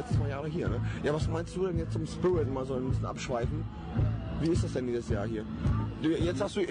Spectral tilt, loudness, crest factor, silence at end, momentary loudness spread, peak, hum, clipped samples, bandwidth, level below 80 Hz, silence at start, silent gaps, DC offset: -7 dB/octave; -32 LUFS; 10 dB; 0 s; 4 LU; -20 dBFS; none; under 0.1%; 10 kHz; -42 dBFS; 0 s; none; under 0.1%